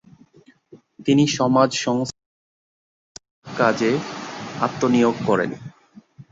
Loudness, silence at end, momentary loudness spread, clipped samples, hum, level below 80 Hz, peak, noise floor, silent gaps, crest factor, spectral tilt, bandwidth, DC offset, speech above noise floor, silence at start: -21 LUFS; 0.1 s; 15 LU; under 0.1%; none; -60 dBFS; -2 dBFS; -54 dBFS; 2.26-3.15 s, 3.31-3.42 s; 20 dB; -5 dB/octave; 7.8 kHz; under 0.1%; 35 dB; 0.75 s